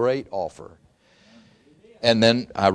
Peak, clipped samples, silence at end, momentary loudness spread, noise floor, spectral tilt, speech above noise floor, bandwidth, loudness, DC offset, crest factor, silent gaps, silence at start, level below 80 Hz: -2 dBFS; under 0.1%; 0 s; 13 LU; -56 dBFS; -5 dB/octave; 34 dB; 10.5 kHz; -21 LUFS; under 0.1%; 22 dB; none; 0 s; -60 dBFS